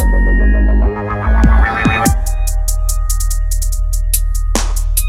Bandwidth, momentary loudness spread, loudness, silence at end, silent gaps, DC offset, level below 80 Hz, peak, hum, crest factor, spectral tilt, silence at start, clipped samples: 15.5 kHz; 7 LU; -15 LUFS; 0 s; none; under 0.1%; -12 dBFS; 0 dBFS; none; 12 dB; -4.5 dB/octave; 0 s; under 0.1%